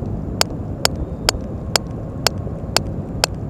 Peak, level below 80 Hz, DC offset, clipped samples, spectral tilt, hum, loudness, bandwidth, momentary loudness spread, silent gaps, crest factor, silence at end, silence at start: 0 dBFS; -32 dBFS; 0.1%; 0.1%; -3.5 dB/octave; none; -21 LUFS; 16 kHz; 6 LU; none; 22 dB; 0 s; 0 s